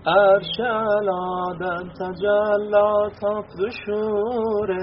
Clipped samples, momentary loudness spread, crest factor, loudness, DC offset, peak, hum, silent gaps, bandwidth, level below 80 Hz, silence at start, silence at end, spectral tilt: under 0.1%; 10 LU; 16 dB; -22 LUFS; under 0.1%; -4 dBFS; none; none; 5.8 kHz; -54 dBFS; 0 s; 0 s; -3 dB/octave